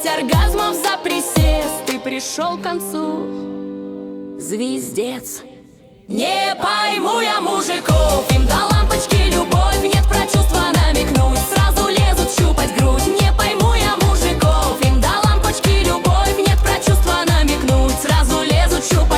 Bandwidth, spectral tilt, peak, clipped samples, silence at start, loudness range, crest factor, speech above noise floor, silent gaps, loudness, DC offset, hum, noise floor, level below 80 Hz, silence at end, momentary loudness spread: 17 kHz; -4.5 dB/octave; -2 dBFS; under 0.1%; 0 s; 8 LU; 14 dB; 28 dB; none; -16 LUFS; under 0.1%; none; -44 dBFS; -20 dBFS; 0 s; 8 LU